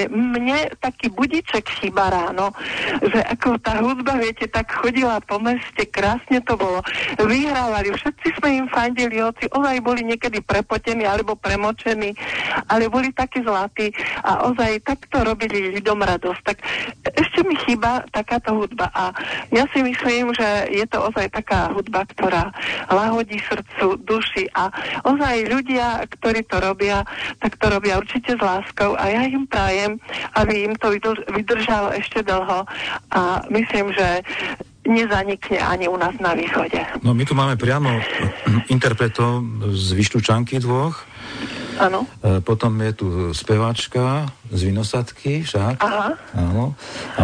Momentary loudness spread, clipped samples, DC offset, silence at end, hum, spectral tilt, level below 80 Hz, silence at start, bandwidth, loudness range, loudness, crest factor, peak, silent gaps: 5 LU; under 0.1%; under 0.1%; 0 s; none; -6 dB/octave; -40 dBFS; 0 s; 10 kHz; 2 LU; -20 LUFS; 16 dB; -4 dBFS; none